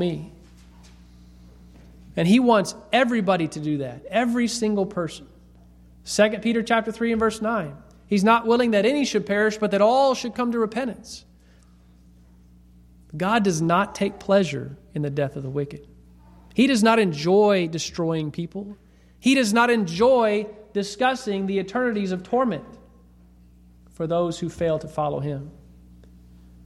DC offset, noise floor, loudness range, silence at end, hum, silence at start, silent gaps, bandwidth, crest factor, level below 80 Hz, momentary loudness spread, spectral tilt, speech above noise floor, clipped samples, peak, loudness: under 0.1%; -52 dBFS; 6 LU; 1.15 s; 60 Hz at -45 dBFS; 0 s; none; 13.5 kHz; 18 dB; -52 dBFS; 14 LU; -5.5 dB/octave; 31 dB; under 0.1%; -4 dBFS; -22 LUFS